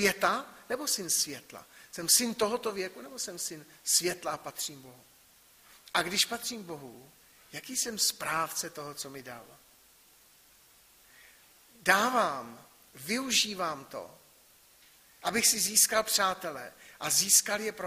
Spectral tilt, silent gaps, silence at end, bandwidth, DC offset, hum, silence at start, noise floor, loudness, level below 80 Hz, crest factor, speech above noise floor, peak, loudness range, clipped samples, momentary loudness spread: -0.5 dB/octave; none; 0 s; 15.5 kHz; under 0.1%; none; 0 s; -61 dBFS; -28 LUFS; -70 dBFS; 26 dB; 30 dB; -6 dBFS; 7 LU; under 0.1%; 21 LU